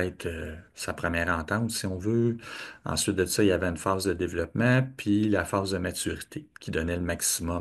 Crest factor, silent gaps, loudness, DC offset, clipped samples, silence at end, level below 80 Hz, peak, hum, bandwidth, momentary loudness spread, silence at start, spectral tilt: 18 dB; none; -28 LUFS; under 0.1%; under 0.1%; 0 s; -52 dBFS; -10 dBFS; none; 13 kHz; 13 LU; 0 s; -4.5 dB/octave